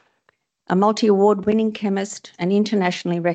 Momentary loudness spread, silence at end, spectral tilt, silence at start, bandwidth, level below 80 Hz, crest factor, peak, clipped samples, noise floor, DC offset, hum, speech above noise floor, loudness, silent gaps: 8 LU; 0 s; -6 dB/octave; 0.7 s; 8.6 kHz; -62 dBFS; 16 dB; -4 dBFS; under 0.1%; -65 dBFS; under 0.1%; none; 47 dB; -19 LUFS; none